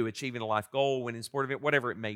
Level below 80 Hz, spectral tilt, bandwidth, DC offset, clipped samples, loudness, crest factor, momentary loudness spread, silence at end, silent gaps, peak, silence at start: -80 dBFS; -5 dB/octave; 16.5 kHz; under 0.1%; under 0.1%; -31 LUFS; 20 dB; 6 LU; 0 s; none; -12 dBFS; 0 s